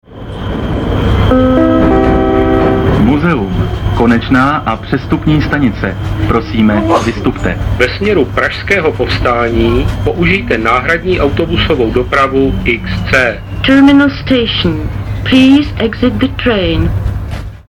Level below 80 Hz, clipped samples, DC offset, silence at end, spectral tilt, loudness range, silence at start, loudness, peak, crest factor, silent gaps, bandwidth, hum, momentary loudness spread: -22 dBFS; under 0.1%; under 0.1%; 0.05 s; -7 dB/octave; 2 LU; 0.1 s; -11 LUFS; 0 dBFS; 10 dB; none; 12 kHz; none; 7 LU